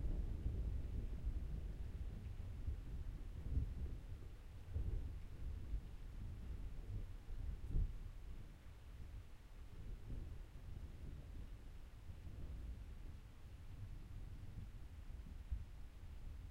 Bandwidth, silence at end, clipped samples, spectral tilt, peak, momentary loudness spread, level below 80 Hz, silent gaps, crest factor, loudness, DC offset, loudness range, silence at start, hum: 13 kHz; 0 s; under 0.1%; -7.5 dB/octave; -30 dBFS; 12 LU; -48 dBFS; none; 18 dB; -52 LUFS; under 0.1%; 7 LU; 0 s; none